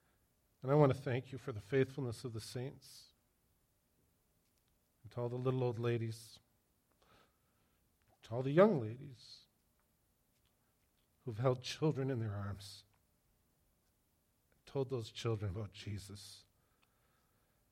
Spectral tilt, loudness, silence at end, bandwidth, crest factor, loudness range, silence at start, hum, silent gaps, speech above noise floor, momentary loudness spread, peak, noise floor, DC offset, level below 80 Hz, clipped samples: -7 dB/octave; -38 LUFS; 1.35 s; 15.5 kHz; 26 dB; 7 LU; 0.65 s; none; none; 41 dB; 22 LU; -16 dBFS; -78 dBFS; under 0.1%; -72 dBFS; under 0.1%